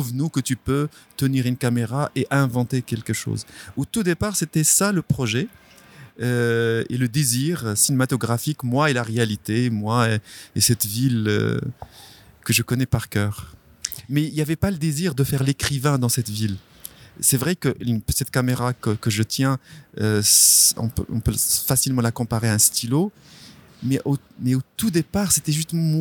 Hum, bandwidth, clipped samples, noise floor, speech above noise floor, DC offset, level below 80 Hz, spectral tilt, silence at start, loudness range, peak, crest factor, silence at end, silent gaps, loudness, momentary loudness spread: none; 19.5 kHz; under 0.1%; -46 dBFS; 25 dB; under 0.1%; -46 dBFS; -4 dB/octave; 0 s; 6 LU; 0 dBFS; 22 dB; 0 s; none; -21 LUFS; 11 LU